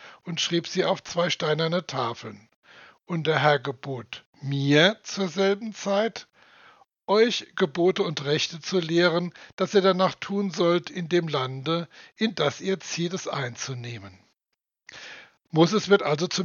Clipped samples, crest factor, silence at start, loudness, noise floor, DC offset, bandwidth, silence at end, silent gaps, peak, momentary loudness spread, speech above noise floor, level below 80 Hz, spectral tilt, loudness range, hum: under 0.1%; 22 dB; 0 s; -25 LUFS; -84 dBFS; under 0.1%; 7.4 kHz; 0 s; 2.56-2.63 s, 4.26-4.33 s, 9.53-9.58 s; -2 dBFS; 14 LU; 59 dB; -76 dBFS; -5 dB/octave; 5 LU; none